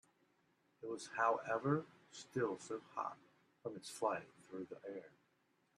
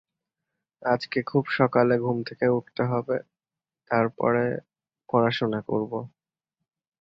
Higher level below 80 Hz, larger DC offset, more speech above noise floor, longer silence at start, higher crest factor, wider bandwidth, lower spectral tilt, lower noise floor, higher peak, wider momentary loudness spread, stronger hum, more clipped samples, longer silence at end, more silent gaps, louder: second, -88 dBFS vs -66 dBFS; neither; second, 37 dB vs over 66 dB; about the same, 0.8 s vs 0.8 s; about the same, 22 dB vs 20 dB; first, 12.5 kHz vs 6.2 kHz; second, -5.5 dB/octave vs -8 dB/octave; second, -79 dBFS vs under -90 dBFS; second, -22 dBFS vs -6 dBFS; first, 16 LU vs 9 LU; neither; neither; second, 0.7 s vs 0.95 s; neither; second, -42 LUFS vs -25 LUFS